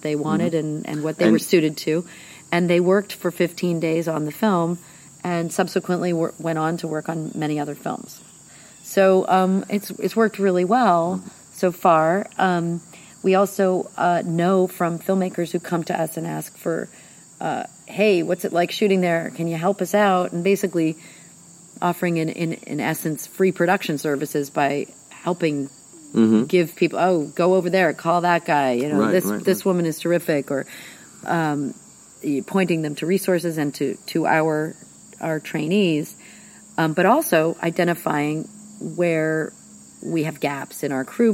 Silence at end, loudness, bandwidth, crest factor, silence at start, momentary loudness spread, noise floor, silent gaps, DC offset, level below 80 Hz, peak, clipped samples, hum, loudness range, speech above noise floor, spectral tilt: 0 s; -21 LUFS; 16.5 kHz; 18 dB; 0 s; 12 LU; -46 dBFS; none; under 0.1%; -70 dBFS; -4 dBFS; under 0.1%; none; 5 LU; 26 dB; -6 dB/octave